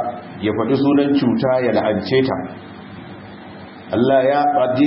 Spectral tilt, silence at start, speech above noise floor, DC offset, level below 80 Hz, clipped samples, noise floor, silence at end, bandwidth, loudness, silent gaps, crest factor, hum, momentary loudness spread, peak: -11.5 dB/octave; 0 s; 20 dB; under 0.1%; -56 dBFS; under 0.1%; -36 dBFS; 0 s; 5.8 kHz; -17 LUFS; none; 14 dB; none; 21 LU; -4 dBFS